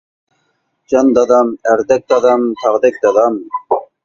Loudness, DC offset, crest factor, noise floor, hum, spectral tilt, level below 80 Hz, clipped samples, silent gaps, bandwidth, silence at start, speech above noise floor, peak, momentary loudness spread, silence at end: -13 LUFS; under 0.1%; 14 dB; -64 dBFS; none; -5 dB/octave; -56 dBFS; under 0.1%; none; 7.4 kHz; 0.9 s; 53 dB; 0 dBFS; 8 LU; 0.2 s